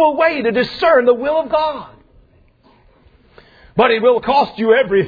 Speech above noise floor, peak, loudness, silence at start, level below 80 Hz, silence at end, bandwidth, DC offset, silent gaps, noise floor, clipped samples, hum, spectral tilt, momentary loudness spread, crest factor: 37 dB; 0 dBFS; -15 LUFS; 0 s; -50 dBFS; 0 s; 5 kHz; under 0.1%; none; -51 dBFS; under 0.1%; none; -7 dB/octave; 6 LU; 14 dB